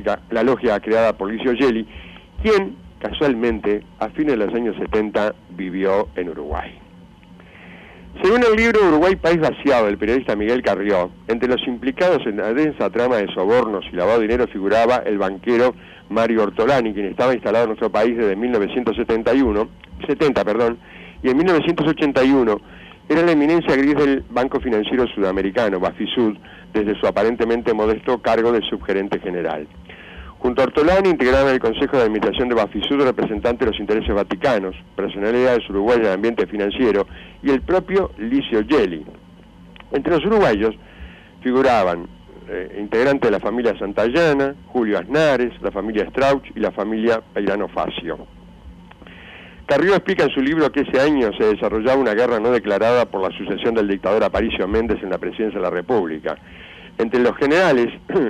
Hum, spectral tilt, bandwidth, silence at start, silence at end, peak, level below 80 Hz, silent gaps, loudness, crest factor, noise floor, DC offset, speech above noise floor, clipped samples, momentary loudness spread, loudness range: none; -6.5 dB/octave; 10.5 kHz; 0 s; 0 s; -8 dBFS; -40 dBFS; none; -19 LUFS; 12 dB; -44 dBFS; under 0.1%; 26 dB; under 0.1%; 10 LU; 4 LU